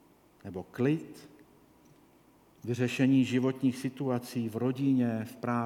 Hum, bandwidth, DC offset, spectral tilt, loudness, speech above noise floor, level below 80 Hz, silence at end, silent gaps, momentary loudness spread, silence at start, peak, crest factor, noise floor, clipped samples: none; 15 kHz; under 0.1%; -7 dB/octave; -30 LUFS; 32 dB; -74 dBFS; 0 s; none; 18 LU; 0.45 s; -14 dBFS; 16 dB; -62 dBFS; under 0.1%